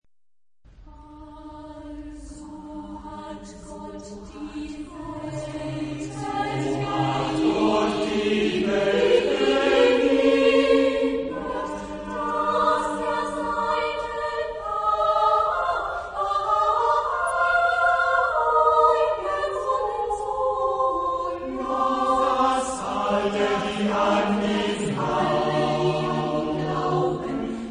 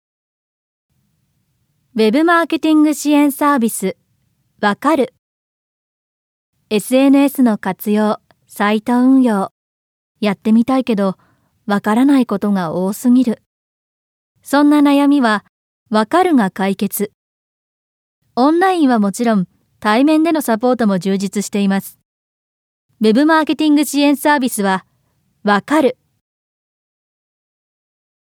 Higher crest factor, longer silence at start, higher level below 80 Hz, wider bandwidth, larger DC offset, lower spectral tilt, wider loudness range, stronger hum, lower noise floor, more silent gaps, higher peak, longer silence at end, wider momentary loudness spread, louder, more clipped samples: about the same, 18 dB vs 16 dB; second, 0.8 s vs 1.95 s; first, -48 dBFS vs -66 dBFS; second, 10.5 kHz vs 17.5 kHz; neither; about the same, -5.5 dB/octave vs -5.5 dB/octave; first, 16 LU vs 3 LU; neither; first, under -90 dBFS vs -64 dBFS; second, none vs 5.19-6.53 s, 9.51-10.15 s, 13.46-14.35 s, 15.49-15.86 s, 17.14-18.22 s, 22.05-22.89 s; second, -6 dBFS vs 0 dBFS; second, 0 s vs 2.45 s; first, 18 LU vs 9 LU; second, -23 LUFS vs -15 LUFS; neither